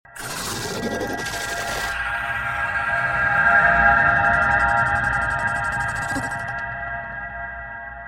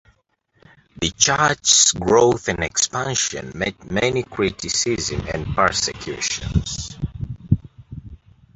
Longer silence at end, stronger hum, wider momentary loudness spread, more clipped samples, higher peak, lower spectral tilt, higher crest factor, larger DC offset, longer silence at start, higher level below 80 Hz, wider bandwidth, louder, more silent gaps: second, 0 s vs 0.4 s; neither; about the same, 15 LU vs 15 LU; neither; second, -4 dBFS vs 0 dBFS; about the same, -3.5 dB/octave vs -2.5 dB/octave; about the same, 18 dB vs 22 dB; neither; second, 0.1 s vs 1 s; about the same, -40 dBFS vs -38 dBFS; first, 17 kHz vs 8.4 kHz; about the same, -20 LUFS vs -19 LUFS; neither